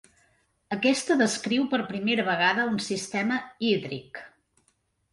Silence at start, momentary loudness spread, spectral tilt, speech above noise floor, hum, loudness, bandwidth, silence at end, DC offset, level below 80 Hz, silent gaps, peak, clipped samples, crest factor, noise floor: 0.7 s; 13 LU; -4 dB/octave; 45 dB; none; -26 LUFS; 11.5 kHz; 0.85 s; under 0.1%; -68 dBFS; none; -10 dBFS; under 0.1%; 18 dB; -71 dBFS